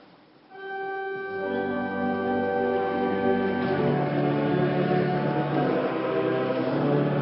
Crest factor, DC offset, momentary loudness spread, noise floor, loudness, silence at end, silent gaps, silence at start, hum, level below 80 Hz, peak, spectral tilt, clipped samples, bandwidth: 14 dB; under 0.1%; 7 LU; -54 dBFS; -26 LUFS; 0 s; none; 0.5 s; none; -62 dBFS; -10 dBFS; -11.5 dB/octave; under 0.1%; 5.8 kHz